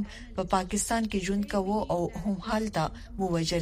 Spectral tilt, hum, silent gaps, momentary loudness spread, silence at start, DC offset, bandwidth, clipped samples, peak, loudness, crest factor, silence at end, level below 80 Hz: -5 dB/octave; none; none; 6 LU; 0 s; under 0.1%; 15.5 kHz; under 0.1%; -10 dBFS; -30 LUFS; 18 dB; 0 s; -44 dBFS